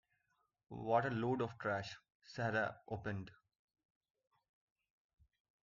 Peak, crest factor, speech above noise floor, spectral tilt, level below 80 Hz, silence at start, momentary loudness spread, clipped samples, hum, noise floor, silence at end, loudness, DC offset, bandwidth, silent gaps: -20 dBFS; 24 dB; 43 dB; -5 dB/octave; -74 dBFS; 0.7 s; 17 LU; under 0.1%; none; -83 dBFS; 2.3 s; -40 LUFS; under 0.1%; 7.2 kHz; 2.15-2.20 s